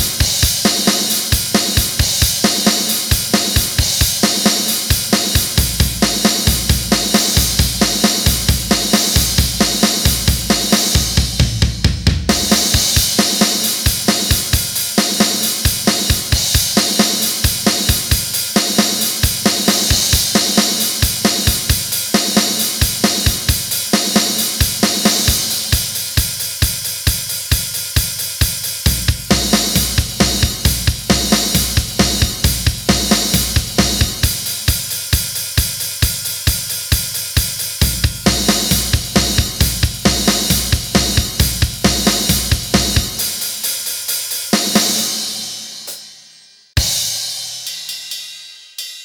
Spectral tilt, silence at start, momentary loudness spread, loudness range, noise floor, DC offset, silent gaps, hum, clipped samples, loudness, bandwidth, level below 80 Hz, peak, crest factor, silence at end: -3 dB/octave; 0 s; 5 LU; 4 LU; -45 dBFS; under 0.1%; none; none; under 0.1%; -14 LUFS; over 20 kHz; -24 dBFS; 0 dBFS; 16 dB; 0 s